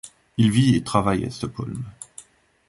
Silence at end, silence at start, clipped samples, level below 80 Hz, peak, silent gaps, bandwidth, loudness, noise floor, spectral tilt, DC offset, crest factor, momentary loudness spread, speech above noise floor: 0.5 s; 0.05 s; under 0.1%; -48 dBFS; -2 dBFS; none; 11.5 kHz; -22 LUFS; -48 dBFS; -6.5 dB/octave; under 0.1%; 20 dB; 18 LU; 27 dB